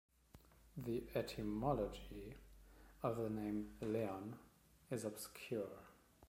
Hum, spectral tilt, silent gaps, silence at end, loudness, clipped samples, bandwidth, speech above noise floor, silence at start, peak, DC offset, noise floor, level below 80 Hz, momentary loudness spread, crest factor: none; -6.5 dB/octave; none; 0 s; -45 LUFS; under 0.1%; 16.5 kHz; 23 dB; 0.35 s; -26 dBFS; under 0.1%; -67 dBFS; -62 dBFS; 18 LU; 20 dB